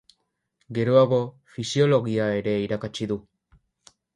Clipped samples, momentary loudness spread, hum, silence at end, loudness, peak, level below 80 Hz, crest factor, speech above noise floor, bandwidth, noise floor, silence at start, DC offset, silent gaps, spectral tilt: under 0.1%; 14 LU; none; 0.95 s; -24 LUFS; -8 dBFS; -60 dBFS; 18 dB; 50 dB; 11 kHz; -73 dBFS; 0.7 s; under 0.1%; none; -6.5 dB/octave